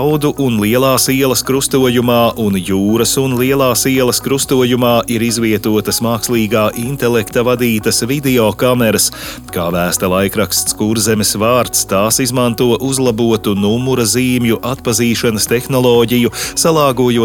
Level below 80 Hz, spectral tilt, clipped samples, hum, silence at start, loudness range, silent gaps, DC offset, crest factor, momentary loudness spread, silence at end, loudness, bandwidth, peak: -40 dBFS; -4 dB/octave; under 0.1%; none; 0 s; 1 LU; none; under 0.1%; 12 dB; 3 LU; 0 s; -13 LUFS; 19 kHz; 0 dBFS